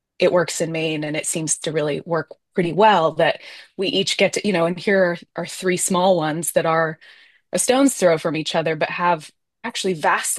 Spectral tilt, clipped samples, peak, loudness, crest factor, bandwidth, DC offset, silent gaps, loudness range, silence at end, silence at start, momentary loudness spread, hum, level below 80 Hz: -3.5 dB/octave; under 0.1%; -2 dBFS; -20 LUFS; 18 dB; 12.5 kHz; under 0.1%; none; 1 LU; 0 s; 0.2 s; 9 LU; none; -66 dBFS